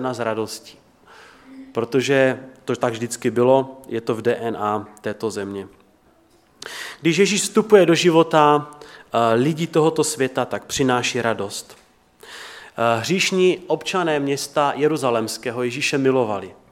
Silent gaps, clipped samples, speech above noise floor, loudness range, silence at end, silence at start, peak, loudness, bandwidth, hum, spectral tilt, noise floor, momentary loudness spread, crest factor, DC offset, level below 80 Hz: none; under 0.1%; 36 dB; 6 LU; 0.2 s; 0 s; 0 dBFS; -20 LUFS; 16.5 kHz; none; -4.5 dB/octave; -56 dBFS; 15 LU; 20 dB; under 0.1%; -62 dBFS